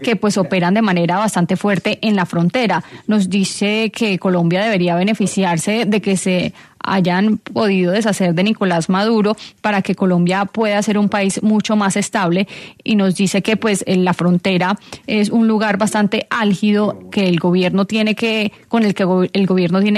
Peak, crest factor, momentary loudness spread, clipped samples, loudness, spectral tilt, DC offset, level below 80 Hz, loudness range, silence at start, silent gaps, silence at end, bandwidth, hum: -2 dBFS; 12 dB; 4 LU; under 0.1%; -16 LUFS; -5.5 dB/octave; under 0.1%; -58 dBFS; 1 LU; 0 s; none; 0 s; 13 kHz; none